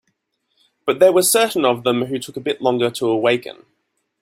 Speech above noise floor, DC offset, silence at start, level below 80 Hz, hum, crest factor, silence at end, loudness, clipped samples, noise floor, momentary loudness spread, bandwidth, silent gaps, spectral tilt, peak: 53 dB; under 0.1%; 0.85 s; -62 dBFS; none; 18 dB; 0.7 s; -18 LUFS; under 0.1%; -70 dBFS; 11 LU; 16.5 kHz; none; -3.5 dB/octave; -2 dBFS